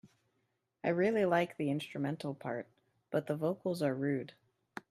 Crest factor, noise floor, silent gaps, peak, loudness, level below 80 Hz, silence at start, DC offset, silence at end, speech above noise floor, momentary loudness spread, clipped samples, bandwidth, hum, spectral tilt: 20 dB; -81 dBFS; none; -16 dBFS; -35 LUFS; -78 dBFS; 0.05 s; under 0.1%; 0.1 s; 47 dB; 14 LU; under 0.1%; 14 kHz; none; -7 dB/octave